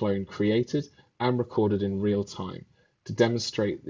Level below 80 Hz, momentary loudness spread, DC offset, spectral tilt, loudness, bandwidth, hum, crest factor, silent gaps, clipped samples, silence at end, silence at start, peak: -56 dBFS; 14 LU; under 0.1%; -6.5 dB/octave; -27 LUFS; 7.8 kHz; none; 18 dB; none; under 0.1%; 0 s; 0 s; -8 dBFS